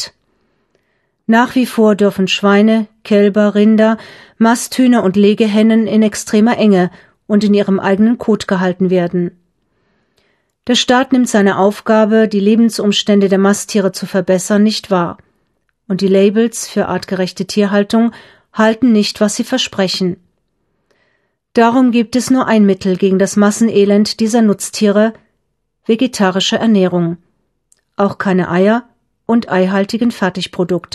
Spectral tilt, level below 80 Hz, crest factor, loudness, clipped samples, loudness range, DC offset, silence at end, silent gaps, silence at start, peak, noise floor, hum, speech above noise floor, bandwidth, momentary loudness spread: -5.5 dB/octave; -56 dBFS; 12 dB; -13 LUFS; under 0.1%; 4 LU; under 0.1%; 0.15 s; none; 0 s; 0 dBFS; -68 dBFS; none; 56 dB; 13 kHz; 7 LU